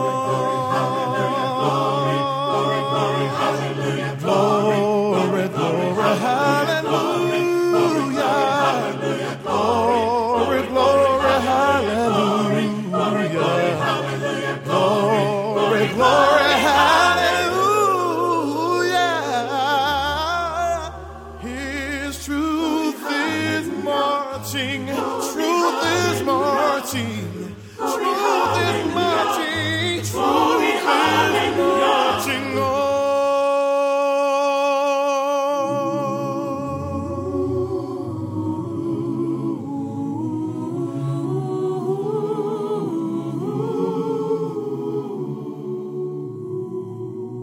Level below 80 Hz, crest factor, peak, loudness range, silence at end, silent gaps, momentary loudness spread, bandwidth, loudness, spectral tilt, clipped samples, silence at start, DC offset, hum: -50 dBFS; 18 dB; -2 dBFS; 8 LU; 0 s; none; 10 LU; 17 kHz; -20 LUFS; -5 dB/octave; under 0.1%; 0 s; under 0.1%; none